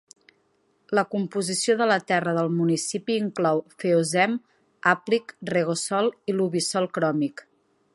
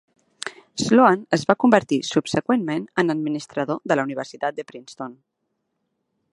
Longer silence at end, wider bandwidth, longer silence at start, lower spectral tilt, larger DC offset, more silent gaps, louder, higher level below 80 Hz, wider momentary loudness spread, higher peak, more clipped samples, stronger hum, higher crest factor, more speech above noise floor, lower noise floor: second, 0.55 s vs 1.2 s; about the same, 11.5 kHz vs 11.5 kHz; first, 0.9 s vs 0.45 s; about the same, -4.5 dB/octave vs -5 dB/octave; neither; neither; second, -24 LUFS vs -21 LUFS; second, -74 dBFS vs -64 dBFS; second, 5 LU vs 19 LU; second, -4 dBFS vs 0 dBFS; neither; neither; about the same, 20 dB vs 22 dB; second, 43 dB vs 55 dB; second, -67 dBFS vs -76 dBFS